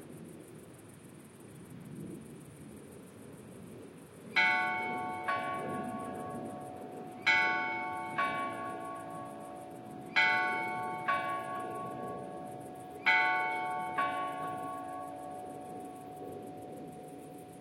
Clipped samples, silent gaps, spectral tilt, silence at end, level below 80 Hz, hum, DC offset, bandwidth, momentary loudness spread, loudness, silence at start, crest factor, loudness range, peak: under 0.1%; none; -4 dB/octave; 0 s; -76 dBFS; none; under 0.1%; 16.5 kHz; 23 LU; -34 LUFS; 0 s; 22 dB; 11 LU; -16 dBFS